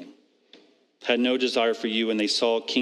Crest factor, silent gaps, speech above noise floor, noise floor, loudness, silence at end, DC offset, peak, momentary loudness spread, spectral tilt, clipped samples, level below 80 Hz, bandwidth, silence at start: 20 dB; none; 33 dB; -56 dBFS; -24 LUFS; 0 s; under 0.1%; -6 dBFS; 3 LU; -3 dB/octave; under 0.1%; -88 dBFS; 12 kHz; 0 s